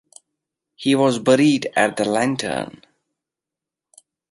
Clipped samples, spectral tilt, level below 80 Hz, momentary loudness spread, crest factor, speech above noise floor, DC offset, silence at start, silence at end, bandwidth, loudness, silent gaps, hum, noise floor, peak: under 0.1%; -5 dB/octave; -64 dBFS; 10 LU; 20 dB; 69 dB; under 0.1%; 0.8 s; 1.6 s; 11.5 kHz; -19 LUFS; none; none; -87 dBFS; -2 dBFS